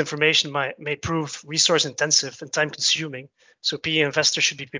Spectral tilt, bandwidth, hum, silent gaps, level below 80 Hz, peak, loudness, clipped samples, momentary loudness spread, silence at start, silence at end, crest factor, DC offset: -2 dB/octave; 7.8 kHz; none; none; -56 dBFS; -4 dBFS; -21 LUFS; under 0.1%; 9 LU; 0 s; 0 s; 20 dB; under 0.1%